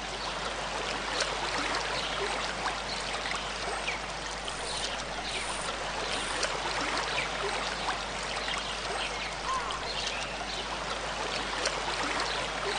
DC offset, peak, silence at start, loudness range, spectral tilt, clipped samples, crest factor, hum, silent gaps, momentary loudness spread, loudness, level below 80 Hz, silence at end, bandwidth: under 0.1%; -10 dBFS; 0 s; 2 LU; -1.5 dB/octave; under 0.1%; 22 dB; none; none; 4 LU; -32 LUFS; -48 dBFS; 0 s; 10 kHz